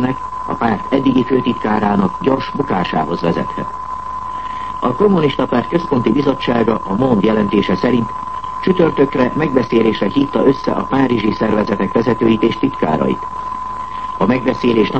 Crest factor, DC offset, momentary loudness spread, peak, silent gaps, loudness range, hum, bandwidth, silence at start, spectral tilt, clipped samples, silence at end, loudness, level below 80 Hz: 16 dB; 1%; 10 LU; 0 dBFS; none; 3 LU; none; 8.4 kHz; 0 s; -8 dB/octave; under 0.1%; 0 s; -16 LUFS; -42 dBFS